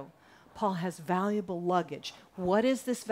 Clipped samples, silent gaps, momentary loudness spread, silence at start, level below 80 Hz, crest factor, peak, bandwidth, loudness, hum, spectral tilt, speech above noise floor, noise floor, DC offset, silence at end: under 0.1%; none; 13 LU; 0 s; -66 dBFS; 18 dB; -14 dBFS; 16 kHz; -31 LUFS; none; -6 dB/octave; 26 dB; -57 dBFS; under 0.1%; 0 s